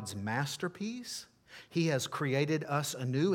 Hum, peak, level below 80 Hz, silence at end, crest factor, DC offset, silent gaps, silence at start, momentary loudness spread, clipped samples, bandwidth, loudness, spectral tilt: none; -16 dBFS; -76 dBFS; 0 s; 18 dB; under 0.1%; none; 0 s; 11 LU; under 0.1%; 17 kHz; -34 LUFS; -5 dB/octave